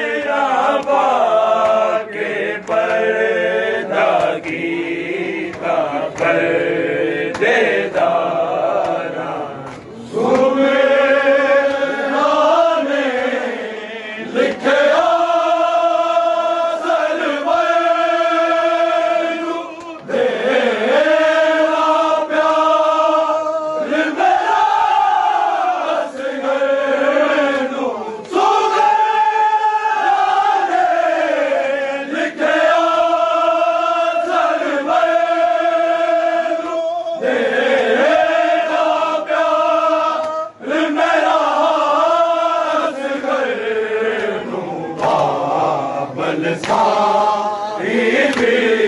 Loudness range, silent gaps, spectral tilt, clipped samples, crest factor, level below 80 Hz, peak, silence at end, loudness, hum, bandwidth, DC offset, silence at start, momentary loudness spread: 3 LU; none; -4.5 dB/octave; under 0.1%; 12 dB; -62 dBFS; -2 dBFS; 0 s; -16 LUFS; none; 11 kHz; under 0.1%; 0 s; 8 LU